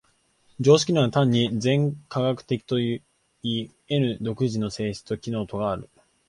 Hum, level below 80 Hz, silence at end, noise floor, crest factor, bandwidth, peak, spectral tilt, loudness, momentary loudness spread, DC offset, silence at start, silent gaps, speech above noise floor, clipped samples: none; -56 dBFS; 0.45 s; -63 dBFS; 20 dB; 11.5 kHz; -6 dBFS; -6 dB/octave; -25 LUFS; 11 LU; under 0.1%; 0.6 s; none; 40 dB; under 0.1%